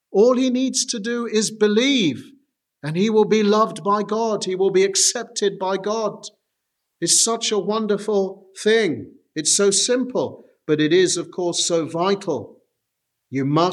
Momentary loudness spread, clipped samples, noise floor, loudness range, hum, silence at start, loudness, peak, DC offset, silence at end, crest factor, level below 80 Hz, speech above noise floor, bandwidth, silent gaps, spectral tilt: 11 LU; under 0.1%; -78 dBFS; 2 LU; none; 0.1 s; -19 LUFS; -4 dBFS; under 0.1%; 0 s; 16 dB; -76 dBFS; 58 dB; 13.5 kHz; none; -3 dB/octave